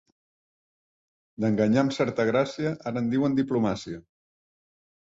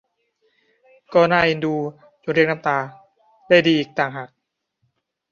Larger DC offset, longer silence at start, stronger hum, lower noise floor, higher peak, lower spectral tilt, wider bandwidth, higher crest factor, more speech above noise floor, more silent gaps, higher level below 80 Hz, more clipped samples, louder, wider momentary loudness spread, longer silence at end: neither; first, 1.4 s vs 1.1 s; neither; first, under -90 dBFS vs -72 dBFS; second, -8 dBFS vs -2 dBFS; about the same, -7 dB/octave vs -6.5 dB/octave; first, 7.8 kHz vs 7 kHz; about the same, 18 dB vs 20 dB; first, over 65 dB vs 53 dB; neither; about the same, -62 dBFS vs -60 dBFS; neither; second, -26 LUFS vs -19 LUFS; second, 8 LU vs 18 LU; about the same, 1.05 s vs 1.05 s